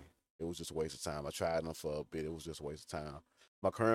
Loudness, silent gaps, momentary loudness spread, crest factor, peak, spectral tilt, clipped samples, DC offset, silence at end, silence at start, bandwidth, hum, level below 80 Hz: -41 LUFS; 0.30-0.39 s, 3.48-3.62 s; 9 LU; 22 dB; -18 dBFS; -5 dB/octave; under 0.1%; under 0.1%; 0 s; 0 s; 16 kHz; none; -60 dBFS